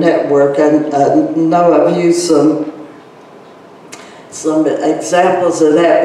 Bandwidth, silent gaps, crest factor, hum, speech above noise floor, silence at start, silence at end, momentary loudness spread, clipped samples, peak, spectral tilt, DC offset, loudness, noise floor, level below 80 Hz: 12 kHz; none; 12 dB; none; 27 dB; 0 s; 0 s; 12 LU; under 0.1%; 0 dBFS; -5.5 dB/octave; under 0.1%; -11 LUFS; -37 dBFS; -60 dBFS